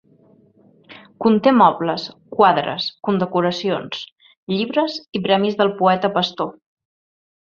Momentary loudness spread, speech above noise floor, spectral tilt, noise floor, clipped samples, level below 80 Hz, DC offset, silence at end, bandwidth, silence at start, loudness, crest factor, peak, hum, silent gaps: 13 LU; 35 dB; -6.5 dB/octave; -53 dBFS; under 0.1%; -62 dBFS; under 0.1%; 0.9 s; 7.2 kHz; 0.9 s; -19 LUFS; 18 dB; 0 dBFS; none; 4.12-4.16 s, 4.37-4.47 s